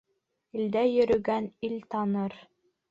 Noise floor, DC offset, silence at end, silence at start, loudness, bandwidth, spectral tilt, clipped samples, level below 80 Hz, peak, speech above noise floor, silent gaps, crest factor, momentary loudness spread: -71 dBFS; under 0.1%; 0.5 s; 0.55 s; -28 LUFS; 7.6 kHz; -8 dB/octave; under 0.1%; -64 dBFS; -12 dBFS; 44 dB; none; 16 dB; 11 LU